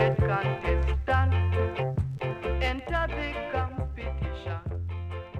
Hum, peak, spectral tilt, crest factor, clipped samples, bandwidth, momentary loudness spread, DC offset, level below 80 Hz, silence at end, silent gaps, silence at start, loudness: none; -10 dBFS; -8 dB/octave; 18 dB; under 0.1%; 7 kHz; 9 LU; under 0.1%; -34 dBFS; 0 s; none; 0 s; -29 LUFS